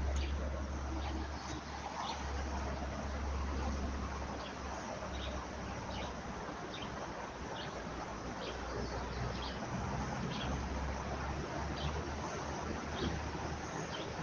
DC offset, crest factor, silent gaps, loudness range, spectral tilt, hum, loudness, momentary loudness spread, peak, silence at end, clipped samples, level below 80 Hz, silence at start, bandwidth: under 0.1%; 14 dB; none; 3 LU; -5 dB/octave; none; -41 LUFS; 4 LU; -26 dBFS; 0 s; under 0.1%; -44 dBFS; 0 s; 7.4 kHz